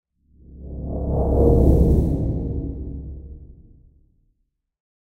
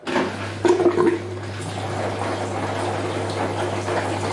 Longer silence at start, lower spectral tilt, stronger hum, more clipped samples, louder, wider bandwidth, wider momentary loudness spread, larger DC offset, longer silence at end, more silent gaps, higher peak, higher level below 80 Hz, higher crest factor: first, 0.5 s vs 0 s; first, -12 dB/octave vs -5.5 dB/octave; neither; neither; first, -20 LUFS vs -23 LUFS; second, 1.4 kHz vs 11.5 kHz; first, 22 LU vs 9 LU; neither; first, 1.55 s vs 0 s; neither; about the same, -4 dBFS vs -4 dBFS; first, -26 dBFS vs -58 dBFS; about the same, 18 dB vs 18 dB